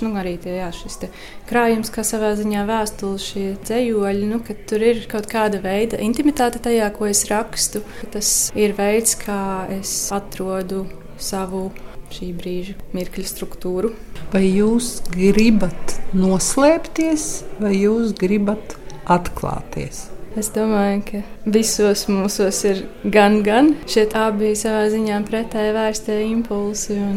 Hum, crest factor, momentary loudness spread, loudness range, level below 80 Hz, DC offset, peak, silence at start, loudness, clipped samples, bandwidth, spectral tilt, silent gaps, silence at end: none; 18 dB; 13 LU; 7 LU; -36 dBFS; under 0.1%; 0 dBFS; 0 s; -19 LUFS; under 0.1%; 16.5 kHz; -4.5 dB/octave; none; 0 s